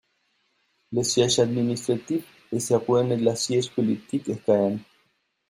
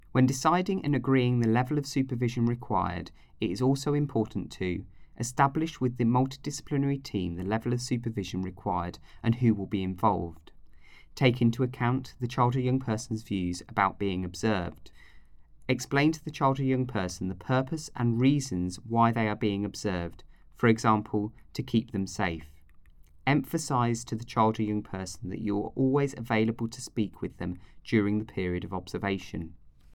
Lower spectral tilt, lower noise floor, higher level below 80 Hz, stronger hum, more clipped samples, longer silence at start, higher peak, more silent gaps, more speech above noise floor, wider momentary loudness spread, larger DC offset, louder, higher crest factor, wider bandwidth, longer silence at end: second, -5 dB/octave vs -6.5 dB/octave; first, -70 dBFS vs -53 dBFS; second, -64 dBFS vs -54 dBFS; neither; neither; first, 0.9 s vs 0.15 s; about the same, -6 dBFS vs -8 dBFS; neither; first, 47 dB vs 25 dB; about the same, 9 LU vs 10 LU; neither; first, -24 LUFS vs -29 LUFS; about the same, 18 dB vs 20 dB; about the same, 15.5 kHz vs 16.5 kHz; first, 0.65 s vs 0.25 s